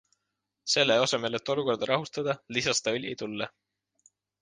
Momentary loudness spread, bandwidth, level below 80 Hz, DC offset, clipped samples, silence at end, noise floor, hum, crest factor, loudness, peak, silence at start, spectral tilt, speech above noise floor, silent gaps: 12 LU; 10 kHz; -70 dBFS; under 0.1%; under 0.1%; 0.95 s; -83 dBFS; none; 22 dB; -28 LUFS; -8 dBFS; 0.65 s; -3 dB/octave; 55 dB; none